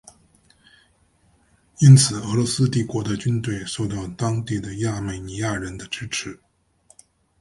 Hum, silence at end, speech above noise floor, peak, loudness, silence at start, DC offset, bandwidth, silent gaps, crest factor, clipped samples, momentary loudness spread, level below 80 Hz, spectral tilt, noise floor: none; 1.05 s; 40 dB; 0 dBFS; -21 LUFS; 1.8 s; under 0.1%; 11.5 kHz; none; 22 dB; under 0.1%; 16 LU; -48 dBFS; -5 dB/octave; -61 dBFS